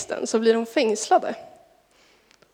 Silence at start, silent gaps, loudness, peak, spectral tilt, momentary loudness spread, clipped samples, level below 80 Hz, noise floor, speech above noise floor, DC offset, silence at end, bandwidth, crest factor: 0 s; none; -22 LUFS; -6 dBFS; -3 dB/octave; 10 LU; under 0.1%; -74 dBFS; -59 dBFS; 37 dB; under 0.1%; 1.05 s; 15.5 kHz; 18 dB